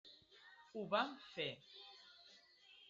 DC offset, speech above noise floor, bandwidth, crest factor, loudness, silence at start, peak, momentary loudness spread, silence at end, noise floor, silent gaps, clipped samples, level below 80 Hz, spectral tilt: under 0.1%; 23 dB; 7.6 kHz; 24 dB; -44 LUFS; 0.05 s; -24 dBFS; 23 LU; 0 s; -67 dBFS; none; under 0.1%; -88 dBFS; -1.5 dB/octave